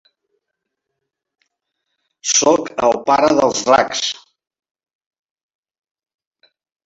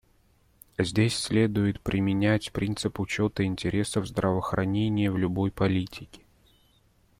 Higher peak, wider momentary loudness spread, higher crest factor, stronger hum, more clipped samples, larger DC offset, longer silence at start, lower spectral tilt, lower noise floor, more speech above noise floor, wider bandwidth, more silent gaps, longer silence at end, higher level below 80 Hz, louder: first, 0 dBFS vs -10 dBFS; first, 10 LU vs 6 LU; about the same, 20 dB vs 18 dB; neither; neither; neither; first, 2.25 s vs 0.8 s; second, -2 dB/octave vs -6 dB/octave; first, -78 dBFS vs -63 dBFS; first, 64 dB vs 37 dB; second, 8 kHz vs 15 kHz; neither; first, 2.75 s vs 1.05 s; second, -56 dBFS vs -50 dBFS; first, -15 LUFS vs -27 LUFS